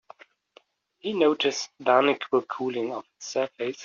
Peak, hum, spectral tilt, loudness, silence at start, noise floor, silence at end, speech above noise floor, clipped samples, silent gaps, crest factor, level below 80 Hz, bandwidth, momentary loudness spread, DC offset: -4 dBFS; none; -2 dB/octave; -26 LUFS; 1.05 s; -60 dBFS; 0 s; 34 dB; under 0.1%; none; 22 dB; -74 dBFS; 7.2 kHz; 11 LU; under 0.1%